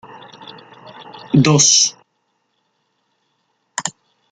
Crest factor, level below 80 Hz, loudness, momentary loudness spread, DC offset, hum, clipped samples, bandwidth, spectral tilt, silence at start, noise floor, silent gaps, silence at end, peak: 20 dB; -58 dBFS; -14 LUFS; 28 LU; under 0.1%; none; under 0.1%; 10.5 kHz; -3 dB/octave; 0.4 s; -68 dBFS; none; 0.45 s; -2 dBFS